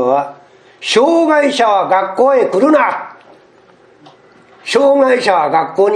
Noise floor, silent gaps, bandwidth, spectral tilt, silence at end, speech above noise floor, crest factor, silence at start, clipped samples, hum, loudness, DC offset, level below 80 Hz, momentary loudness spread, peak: -46 dBFS; none; 11.5 kHz; -4 dB/octave; 0 s; 34 dB; 14 dB; 0 s; under 0.1%; none; -12 LUFS; under 0.1%; -64 dBFS; 13 LU; 0 dBFS